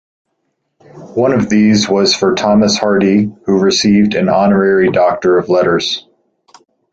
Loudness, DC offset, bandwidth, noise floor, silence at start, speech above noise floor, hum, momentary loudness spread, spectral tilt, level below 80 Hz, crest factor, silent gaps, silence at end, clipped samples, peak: -12 LUFS; under 0.1%; 8 kHz; -68 dBFS; 0.95 s; 57 dB; none; 5 LU; -5 dB/octave; -46 dBFS; 12 dB; none; 0.9 s; under 0.1%; 0 dBFS